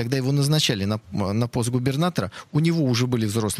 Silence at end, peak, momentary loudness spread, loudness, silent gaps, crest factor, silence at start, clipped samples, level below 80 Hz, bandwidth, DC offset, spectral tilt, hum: 0 s; -6 dBFS; 6 LU; -23 LUFS; none; 16 dB; 0 s; under 0.1%; -54 dBFS; 15.5 kHz; under 0.1%; -5.5 dB/octave; none